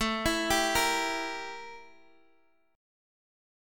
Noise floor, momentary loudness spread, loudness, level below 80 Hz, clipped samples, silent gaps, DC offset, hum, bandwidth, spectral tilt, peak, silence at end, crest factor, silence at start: -69 dBFS; 16 LU; -28 LUFS; -50 dBFS; under 0.1%; none; under 0.1%; none; 17.5 kHz; -2 dB/octave; -12 dBFS; 1 s; 20 dB; 0 s